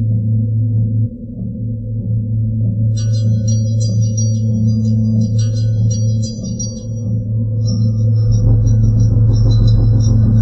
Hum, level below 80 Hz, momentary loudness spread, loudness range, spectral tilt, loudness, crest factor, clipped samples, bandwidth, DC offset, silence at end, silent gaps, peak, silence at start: none; -24 dBFS; 10 LU; 4 LU; -8 dB/octave; -15 LUFS; 12 dB; under 0.1%; 6.4 kHz; under 0.1%; 0 s; none; -2 dBFS; 0 s